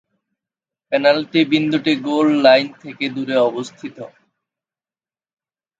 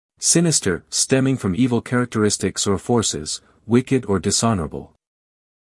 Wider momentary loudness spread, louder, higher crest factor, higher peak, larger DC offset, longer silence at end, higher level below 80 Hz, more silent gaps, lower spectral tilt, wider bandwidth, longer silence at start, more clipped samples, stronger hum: first, 19 LU vs 9 LU; first, -16 LUFS vs -19 LUFS; about the same, 18 dB vs 18 dB; about the same, 0 dBFS vs -2 dBFS; neither; first, 1.75 s vs 0.9 s; second, -70 dBFS vs -50 dBFS; neither; first, -5.5 dB/octave vs -4 dB/octave; second, 7.8 kHz vs 12 kHz; first, 0.9 s vs 0.2 s; neither; neither